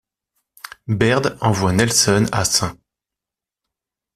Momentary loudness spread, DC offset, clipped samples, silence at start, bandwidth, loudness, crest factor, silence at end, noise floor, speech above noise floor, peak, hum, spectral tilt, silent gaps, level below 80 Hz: 13 LU; under 0.1%; under 0.1%; 0.9 s; 15 kHz; -17 LUFS; 18 dB; 1.4 s; -87 dBFS; 70 dB; -2 dBFS; none; -4 dB/octave; none; -46 dBFS